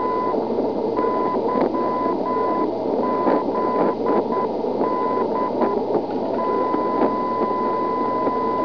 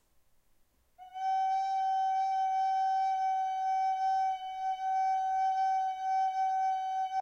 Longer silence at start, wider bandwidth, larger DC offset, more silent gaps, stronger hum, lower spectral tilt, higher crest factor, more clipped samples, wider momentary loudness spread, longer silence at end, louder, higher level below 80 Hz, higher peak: second, 0 s vs 1 s; second, 5.4 kHz vs 7.4 kHz; first, 0.5% vs under 0.1%; neither; neither; first, -8.5 dB/octave vs 0.5 dB/octave; first, 16 dB vs 6 dB; neither; about the same, 2 LU vs 4 LU; about the same, 0 s vs 0 s; first, -21 LUFS vs -31 LUFS; first, -56 dBFS vs -74 dBFS; first, -6 dBFS vs -24 dBFS